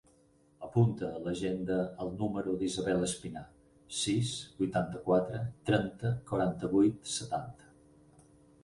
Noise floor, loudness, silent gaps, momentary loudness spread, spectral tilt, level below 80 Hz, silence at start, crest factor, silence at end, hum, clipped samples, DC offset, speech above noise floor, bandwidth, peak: -66 dBFS; -33 LUFS; none; 9 LU; -5.5 dB/octave; -60 dBFS; 0.6 s; 20 dB; 1.1 s; none; under 0.1%; under 0.1%; 34 dB; 11.5 kHz; -14 dBFS